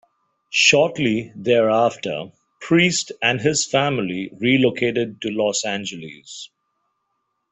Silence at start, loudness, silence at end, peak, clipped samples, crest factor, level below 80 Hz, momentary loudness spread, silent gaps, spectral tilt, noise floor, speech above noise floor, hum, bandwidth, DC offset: 0.5 s; -19 LUFS; 1.05 s; -2 dBFS; under 0.1%; 20 dB; -60 dBFS; 19 LU; none; -3.5 dB/octave; -73 dBFS; 54 dB; none; 8.4 kHz; under 0.1%